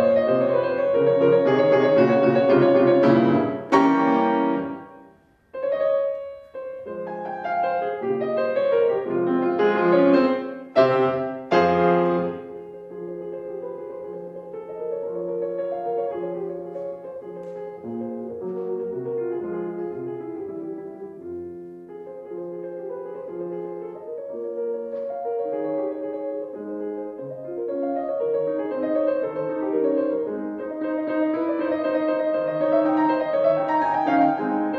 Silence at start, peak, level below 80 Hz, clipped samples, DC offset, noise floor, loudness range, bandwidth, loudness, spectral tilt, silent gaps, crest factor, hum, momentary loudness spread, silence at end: 0 s; -4 dBFS; -66 dBFS; under 0.1%; under 0.1%; -54 dBFS; 14 LU; 6.8 kHz; -23 LUFS; -8 dB/octave; none; 18 dB; none; 17 LU; 0 s